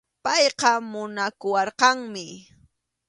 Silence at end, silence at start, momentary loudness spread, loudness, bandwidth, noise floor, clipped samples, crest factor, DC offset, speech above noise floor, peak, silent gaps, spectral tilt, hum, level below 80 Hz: 0.7 s; 0.25 s; 15 LU; -22 LUFS; 11.5 kHz; -63 dBFS; under 0.1%; 22 dB; under 0.1%; 39 dB; -2 dBFS; none; -1.5 dB/octave; none; -68 dBFS